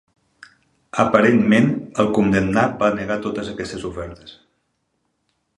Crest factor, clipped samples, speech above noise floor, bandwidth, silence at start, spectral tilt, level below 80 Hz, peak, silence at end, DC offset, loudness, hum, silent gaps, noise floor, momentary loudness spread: 20 dB; under 0.1%; 52 dB; 11 kHz; 0.95 s; -6.5 dB/octave; -48 dBFS; 0 dBFS; 1.25 s; under 0.1%; -19 LUFS; none; none; -71 dBFS; 14 LU